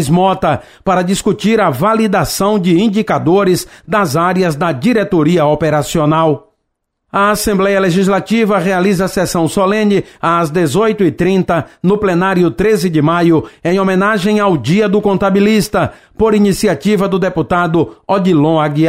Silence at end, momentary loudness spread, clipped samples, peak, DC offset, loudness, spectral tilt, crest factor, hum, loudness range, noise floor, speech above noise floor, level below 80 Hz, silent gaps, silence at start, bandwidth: 0 s; 4 LU; under 0.1%; -2 dBFS; 0.3%; -12 LUFS; -6 dB/octave; 10 dB; none; 1 LU; -70 dBFS; 58 dB; -40 dBFS; none; 0 s; 16 kHz